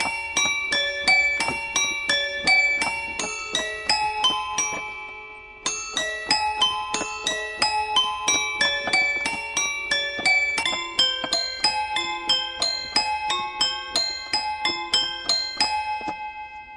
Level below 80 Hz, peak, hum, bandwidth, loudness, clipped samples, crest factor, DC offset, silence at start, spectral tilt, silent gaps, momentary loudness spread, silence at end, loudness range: -54 dBFS; -6 dBFS; none; 11.5 kHz; -22 LUFS; under 0.1%; 20 dB; under 0.1%; 0 s; 0.5 dB/octave; none; 9 LU; 0 s; 4 LU